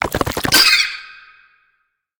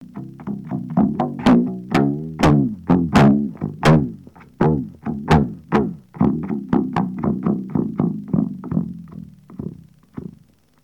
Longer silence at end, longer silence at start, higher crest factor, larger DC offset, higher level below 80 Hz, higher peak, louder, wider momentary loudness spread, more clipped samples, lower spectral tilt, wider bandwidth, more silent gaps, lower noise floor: first, 1.1 s vs 0.6 s; about the same, 0 s vs 0 s; about the same, 18 dB vs 20 dB; neither; about the same, -40 dBFS vs -40 dBFS; about the same, 0 dBFS vs 0 dBFS; first, -13 LUFS vs -19 LUFS; second, 12 LU vs 20 LU; neither; second, -1.5 dB/octave vs -8 dB/octave; first, over 20 kHz vs 12 kHz; neither; first, -67 dBFS vs -52 dBFS